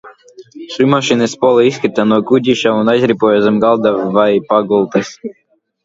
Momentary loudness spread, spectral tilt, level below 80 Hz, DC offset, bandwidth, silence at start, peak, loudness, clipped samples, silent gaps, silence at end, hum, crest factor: 6 LU; -5.5 dB/octave; -56 dBFS; under 0.1%; 7.8 kHz; 0.05 s; 0 dBFS; -12 LUFS; under 0.1%; none; 0.55 s; none; 12 dB